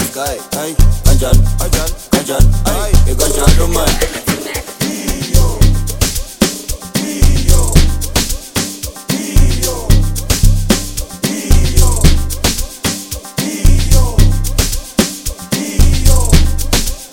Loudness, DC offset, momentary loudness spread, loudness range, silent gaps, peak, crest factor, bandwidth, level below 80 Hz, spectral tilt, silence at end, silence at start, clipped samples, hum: -14 LUFS; under 0.1%; 8 LU; 2 LU; none; 0 dBFS; 10 dB; 17.5 kHz; -12 dBFS; -4.5 dB/octave; 0.05 s; 0 s; 0.1%; none